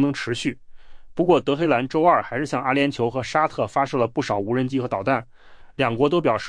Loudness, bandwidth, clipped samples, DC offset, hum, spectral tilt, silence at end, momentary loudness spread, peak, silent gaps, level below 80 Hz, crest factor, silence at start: -22 LUFS; 10.5 kHz; under 0.1%; under 0.1%; none; -6 dB/octave; 0 s; 7 LU; -6 dBFS; none; -52 dBFS; 16 dB; 0 s